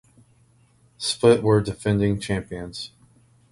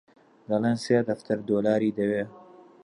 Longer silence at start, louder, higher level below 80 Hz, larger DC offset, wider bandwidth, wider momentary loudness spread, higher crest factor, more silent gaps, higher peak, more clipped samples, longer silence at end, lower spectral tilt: first, 1 s vs 0.5 s; first, -22 LUFS vs -26 LUFS; first, -48 dBFS vs -68 dBFS; neither; about the same, 11.5 kHz vs 11 kHz; first, 16 LU vs 6 LU; about the same, 20 dB vs 18 dB; neither; first, -4 dBFS vs -10 dBFS; neither; first, 0.65 s vs 0.4 s; second, -5.5 dB/octave vs -7 dB/octave